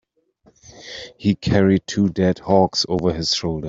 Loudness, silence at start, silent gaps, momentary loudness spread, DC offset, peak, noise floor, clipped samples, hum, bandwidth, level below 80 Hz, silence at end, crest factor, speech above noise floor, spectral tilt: -19 LUFS; 0.75 s; none; 12 LU; under 0.1%; -2 dBFS; -58 dBFS; under 0.1%; none; 7.8 kHz; -46 dBFS; 0 s; 18 dB; 39 dB; -5.5 dB/octave